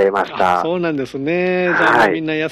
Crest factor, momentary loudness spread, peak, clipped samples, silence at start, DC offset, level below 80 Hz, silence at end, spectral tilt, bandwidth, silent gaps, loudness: 14 dB; 8 LU; -2 dBFS; under 0.1%; 0 s; under 0.1%; -52 dBFS; 0 s; -6 dB/octave; 13.5 kHz; none; -16 LUFS